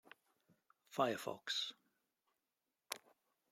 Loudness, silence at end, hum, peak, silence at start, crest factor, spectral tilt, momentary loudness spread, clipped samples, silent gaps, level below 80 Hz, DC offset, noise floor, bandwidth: -43 LUFS; 0.55 s; none; -20 dBFS; 0.9 s; 28 dB; -3 dB/octave; 11 LU; under 0.1%; none; under -90 dBFS; under 0.1%; under -90 dBFS; 16 kHz